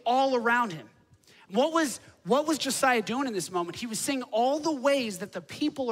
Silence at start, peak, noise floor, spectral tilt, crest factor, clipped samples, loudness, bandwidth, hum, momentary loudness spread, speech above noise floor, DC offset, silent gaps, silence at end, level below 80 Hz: 0.05 s; -10 dBFS; -58 dBFS; -3 dB/octave; 18 dB; under 0.1%; -28 LUFS; 16 kHz; none; 8 LU; 31 dB; under 0.1%; none; 0 s; -72 dBFS